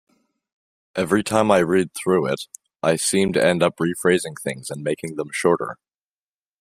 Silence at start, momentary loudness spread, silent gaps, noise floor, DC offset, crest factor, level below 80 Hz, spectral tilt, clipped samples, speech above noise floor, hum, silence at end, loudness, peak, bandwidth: 0.95 s; 11 LU; none; under -90 dBFS; under 0.1%; 20 dB; -58 dBFS; -4.5 dB/octave; under 0.1%; over 70 dB; none; 0.85 s; -21 LUFS; -2 dBFS; 15.5 kHz